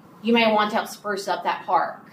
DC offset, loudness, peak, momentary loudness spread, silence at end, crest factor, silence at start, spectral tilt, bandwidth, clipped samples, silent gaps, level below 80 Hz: under 0.1%; -22 LUFS; -6 dBFS; 9 LU; 0.1 s; 18 dB; 0.25 s; -4 dB/octave; 15.5 kHz; under 0.1%; none; -76 dBFS